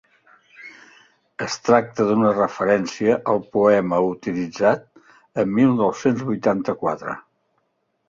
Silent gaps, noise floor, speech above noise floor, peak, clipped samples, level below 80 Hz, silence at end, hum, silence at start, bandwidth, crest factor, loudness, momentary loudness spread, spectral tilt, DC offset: none; -70 dBFS; 51 dB; -2 dBFS; under 0.1%; -60 dBFS; 0.9 s; none; 0.6 s; 7.6 kHz; 20 dB; -20 LUFS; 14 LU; -6.5 dB/octave; under 0.1%